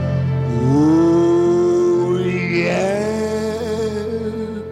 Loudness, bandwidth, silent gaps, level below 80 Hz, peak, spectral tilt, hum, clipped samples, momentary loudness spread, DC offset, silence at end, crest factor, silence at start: -17 LUFS; 11 kHz; none; -44 dBFS; -6 dBFS; -7.5 dB/octave; none; under 0.1%; 9 LU; under 0.1%; 0 s; 10 dB; 0 s